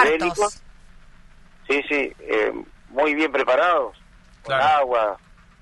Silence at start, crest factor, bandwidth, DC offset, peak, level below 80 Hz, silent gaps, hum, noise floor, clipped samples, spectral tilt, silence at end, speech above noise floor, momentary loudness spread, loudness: 0 s; 20 dB; 11.5 kHz; under 0.1%; -2 dBFS; -50 dBFS; none; none; -47 dBFS; under 0.1%; -3.5 dB/octave; 0.45 s; 26 dB; 12 LU; -21 LUFS